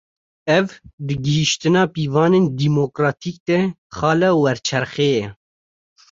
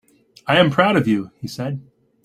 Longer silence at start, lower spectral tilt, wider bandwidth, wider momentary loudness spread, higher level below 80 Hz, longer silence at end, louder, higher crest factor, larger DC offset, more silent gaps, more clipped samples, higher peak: about the same, 0.45 s vs 0.45 s; about the same, -5.5 dB/octave vs -6.5 dB/octave; second, 7.8 kHz vs 15 kHz; second, 11 LU vs 17 LU; about the same, -52 dBFS vs -56 dBFS; first, 0.8 s vs 0.45 s; about the same, -18 LUFS vs -18 LUFS; about the same, 16 dB vs 18 dB; neither; first, 0.93-0.98 s, 3.40-3.46 s, 3.78-3.90 s vs none; neither; about the same, -2 dBFS vs -2 dBFS